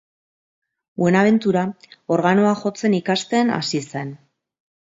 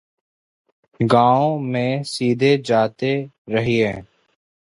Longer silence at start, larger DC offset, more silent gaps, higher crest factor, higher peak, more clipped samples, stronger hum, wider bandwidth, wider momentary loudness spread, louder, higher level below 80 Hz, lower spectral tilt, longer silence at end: about the same, 1 s vs 1 s; neither; second, none vs 3.38-3.45 s; about the same, 18 dB vs 20 dB; about the same, -2 dBFS vs 0 dBFS; neither; neither; second, 7.8 kHz vs 11.5 kHz; first, 14 LU vs 9 LU; about the same, -19 LUFS vs -19 LUFS; second, -66 dBFS vs -56 dBFS; about the same, -6 dB/octave vs -6.5 dB/octave; about the same, 0.7 s vs 0.65 s